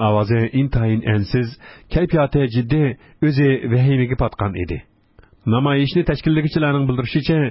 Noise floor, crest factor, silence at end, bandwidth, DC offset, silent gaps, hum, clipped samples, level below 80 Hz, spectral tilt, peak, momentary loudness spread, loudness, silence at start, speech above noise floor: -51 dBFS; 14 dB; 0 s; 5.8 kHz; under 0.1%; none; none; under 0.1%; -36 dBFS; -12 dB/octave; -4 dBFS; 7 LU; -19 LUFS; 0 s; 33 dB